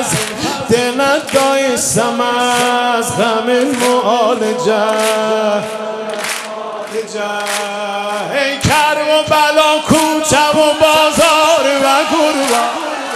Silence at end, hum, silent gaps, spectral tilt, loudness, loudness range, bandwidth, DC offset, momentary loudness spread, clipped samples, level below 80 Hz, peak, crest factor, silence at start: 0 s; none; none; -3 dB/octave; -13 LUFS; 7 LU; 16 kHz; under 0.1%; 10 LU; under 0.1%; -44 dBFS; 0 dBFS; 14 dB; 0 s